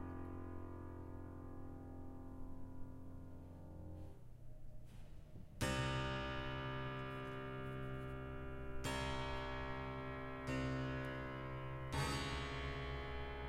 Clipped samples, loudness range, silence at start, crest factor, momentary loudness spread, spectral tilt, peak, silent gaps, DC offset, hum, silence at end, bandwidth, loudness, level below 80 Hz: under 0.1%; 11 LU; 0 s; 20 dB; 15 LU; -5.5 dB/octave; -26 dBFS; none; under 0.1%; none; 0 s; 15.5 kHz; -46 LUFS; -54 dBFS